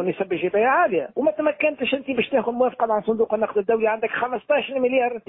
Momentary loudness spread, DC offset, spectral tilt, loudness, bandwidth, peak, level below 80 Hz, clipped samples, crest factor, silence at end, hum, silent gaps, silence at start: 5 LU; under 0.1%; -10 dB/octave; -22 LUFS; 4 kHz; -8 dBFS; -64 dBFS; under 0.1%; 14 dB; 0.1 s; none; none; 0 s